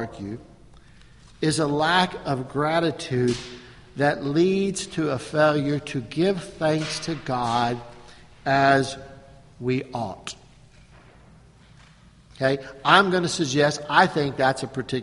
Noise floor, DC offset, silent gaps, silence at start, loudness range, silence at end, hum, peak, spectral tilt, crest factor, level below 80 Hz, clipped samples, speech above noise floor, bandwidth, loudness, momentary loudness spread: -52 dBFS; under 0.1%; none; 0 s; 7 LU; 0 s; none; 0 dBFS; -5 dB/octave; 24 dB; -54 dBFS; under 0.1%; 29 dB; 11.5 kHz; -23 LUFS; 15 LU